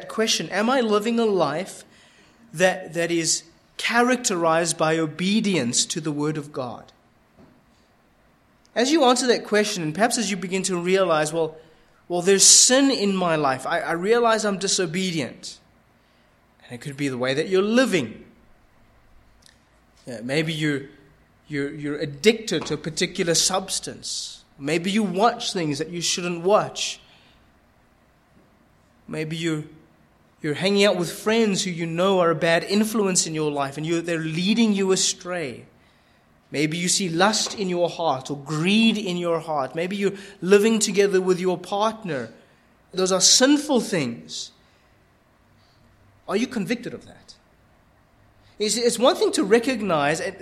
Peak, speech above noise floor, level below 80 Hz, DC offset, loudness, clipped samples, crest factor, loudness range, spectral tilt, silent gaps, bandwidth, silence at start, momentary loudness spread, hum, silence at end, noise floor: -2 dBFS; 37 dB; -62 dBFS; under 0.1%; -21 LUFS; under 0.1%; 22 dB; 11 LU; -3 dB/octave; none; 15.5 kHz; 0 s; 12 LU; none; 0.05 s; -59 dBFS